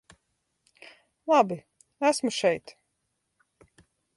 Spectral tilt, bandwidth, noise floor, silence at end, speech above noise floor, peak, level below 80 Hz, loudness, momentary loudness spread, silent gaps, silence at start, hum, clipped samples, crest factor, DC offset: -4 dB/octave; 11.5 kHz; -78 dBFS; 1.45 s; 54 dB; -8 dBFS; -72 dBFS; -26 LUFS; 14 LU; none; 1.25 s; none; under 0.1%; 22 dB; under 0.1%